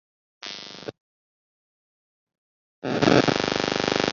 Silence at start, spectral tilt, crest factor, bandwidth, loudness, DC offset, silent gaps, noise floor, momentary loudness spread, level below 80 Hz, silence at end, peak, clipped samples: 0.45 s; -4.5 dB/octave; 24 dB; 7.6 kHz; -22 LUFS; under 0.1%; 1.00-2.27 s, 2.38-2.82 s; under -90 dBFS; 20 LU; -56 dBFS; 0 s; -4 dBFS; under 0.1%